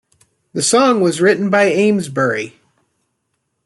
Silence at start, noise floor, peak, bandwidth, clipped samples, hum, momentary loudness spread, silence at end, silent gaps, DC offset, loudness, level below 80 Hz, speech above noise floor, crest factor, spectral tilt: 0.55 s; -71 dBFS; -2 dBFS; 12.5 kHz; under 0.1%; none; 10 LU; 1.15 s; none; under 0.1%; -14 LUFS; -62 dBFS; 56 dB; 14 dB; -4 dB/octave